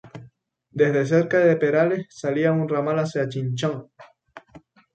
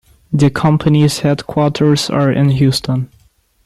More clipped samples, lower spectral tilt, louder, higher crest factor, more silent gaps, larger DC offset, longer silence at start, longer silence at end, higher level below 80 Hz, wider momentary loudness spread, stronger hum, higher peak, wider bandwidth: neither; about the same, -7 dB/octave vs -6.5 dB/octave; second, -22 LUFS vs -14 LUFS; about the same, 16 dB vs 12 dB; neither; neither; second, 0.05 s vs 0.3 s; second, 0.35 s vs 0.6 s; second, -66 dBFS vs -44 dBFS; about the same, 9 LU vs 8 LU; neither; second, -6 dBFS vs -2 dBFS; second, 9 kHz vs 13 kHz